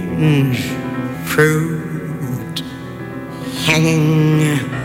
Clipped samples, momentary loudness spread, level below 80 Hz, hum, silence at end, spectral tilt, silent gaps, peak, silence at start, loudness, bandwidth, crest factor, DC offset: under 0.1%; 14 LU; -46 dBFS; none; 0 s; -6 dB/octave; none; -4 dBFS; 0 s; -17 LUFS; 16.5 kHz; 14 dB; under 0.1%